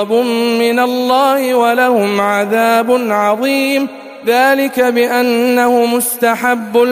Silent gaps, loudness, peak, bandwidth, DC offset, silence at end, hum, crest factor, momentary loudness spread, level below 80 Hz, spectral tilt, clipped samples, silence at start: none; -12 LUFS; 0 dBFS; 15.5 kHz; under 0.1%; 0 s; none; 12 dB; 3 LU; -62 dBFS; -3.5 dB/octave; under 0.1%; 0 s